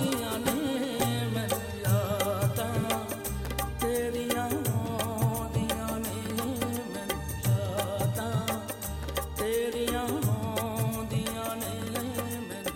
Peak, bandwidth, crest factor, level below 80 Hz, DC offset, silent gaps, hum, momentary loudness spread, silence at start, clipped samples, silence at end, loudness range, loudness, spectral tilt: -12 dBFS; 17 kHz; 18 dB; -46 dBFS; under 0.1%; none; none; 5 LU; 0 s; under 0.1%; 0 s; 2 LU; -31 LUFS; -5 dB/octave